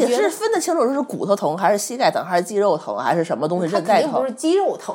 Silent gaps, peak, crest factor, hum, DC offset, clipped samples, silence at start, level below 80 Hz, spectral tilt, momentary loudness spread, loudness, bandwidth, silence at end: none; -4 dBFS; 16 dB; none; under 0.1%; under 0.1%; 0 s; -82 dBFS; -4.5 dB/octave; 4 LU; -20 LUFS; 17 kHz; 0 s